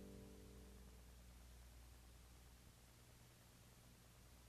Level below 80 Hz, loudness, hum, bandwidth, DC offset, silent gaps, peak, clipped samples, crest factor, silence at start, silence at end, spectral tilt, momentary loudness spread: -66 dBFS; -65 LUFS; 60 Hz at -65 dBFS; 14 kHz; under 0.1%; none; -48 dBFS; under 0.1%; 16 dB; 0 s; 0 s; -4.5 dB/octave; 5 LU